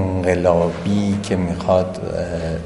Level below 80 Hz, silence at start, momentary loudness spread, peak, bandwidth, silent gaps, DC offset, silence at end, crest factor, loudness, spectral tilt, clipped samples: -34 dBFS; 0 s; 8 LU; 0 dBFS; 11.5 kHz; none; 0.3%; 0 s; 18 dB; -19 LUFS; -7 dB/octave; under 0.1%